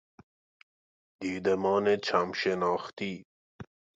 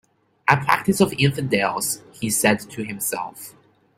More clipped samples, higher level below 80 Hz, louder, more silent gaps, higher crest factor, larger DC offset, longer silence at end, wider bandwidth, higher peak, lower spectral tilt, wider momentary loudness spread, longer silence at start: neither; second, -66 dBFS vs -56 dBFS; second, -29 LUFS vs -21 LUFS; first, 3.25-3.59 s vs none; about the same, 20 dB vs 22 dB; neither; second, 0.35 s vs 0.5 s; second, 7.8 kHz vs 16 kHz; second, -12 dBFS vs 0 dBFS; first, -5.5 dB/octave vs -4 dB/octave; first, 21 LU vs 12 LU; first, 1.2 s vs 0.45 s